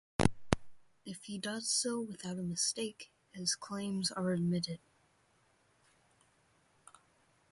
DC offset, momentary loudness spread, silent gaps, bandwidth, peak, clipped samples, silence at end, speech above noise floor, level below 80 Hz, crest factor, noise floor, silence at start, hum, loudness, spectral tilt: under 0.1%; 16 LU; none; 11.5 kHz; -10 dBFS; under 0.1%; 2.75 s; 35 dB; -56 dBFS; 30 dB; -72 dBFS; 0.2 s; none; -36 LUFS; -4 dB/octave